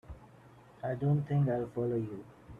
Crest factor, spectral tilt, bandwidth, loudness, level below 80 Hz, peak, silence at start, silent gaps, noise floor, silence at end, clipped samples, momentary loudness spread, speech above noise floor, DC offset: 14 dB; -10.5 dB/octave; 3.7 kHz; -33 LUFS; -60 dBFS; -20 dBFS; 0.05 s; none; -57 dBFS; 0 s; under 0.1%; 19 LU; 25 dB; under 0.1%